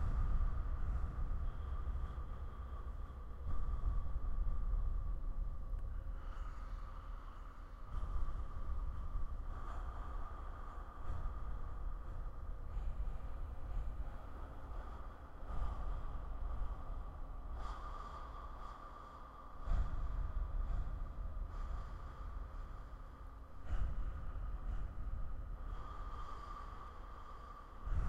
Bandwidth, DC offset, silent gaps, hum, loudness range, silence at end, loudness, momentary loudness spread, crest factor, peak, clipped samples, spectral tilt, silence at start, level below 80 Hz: 5.2 kHz; under 0.1%; none; none; 4 LU; 0 s; -48 LUFS; 10 LU; 16 dB; -24 dBFS; under 0.1%; -8 dB/octave; 0 s; -42 dBFS